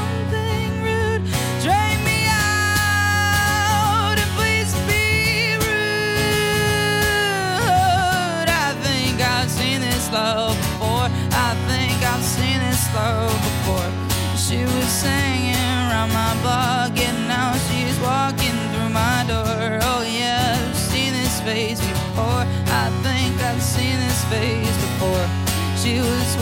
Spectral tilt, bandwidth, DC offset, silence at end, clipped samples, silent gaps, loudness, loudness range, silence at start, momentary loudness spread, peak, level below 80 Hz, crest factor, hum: -4 dB/octave; 17 kHz; under 0.1%; 0 s; under 0.1%; none; -19 LUFS; 3 LU; 0 s; 4 LU; -4 dBFS; -36 dBFS; 16 dB; none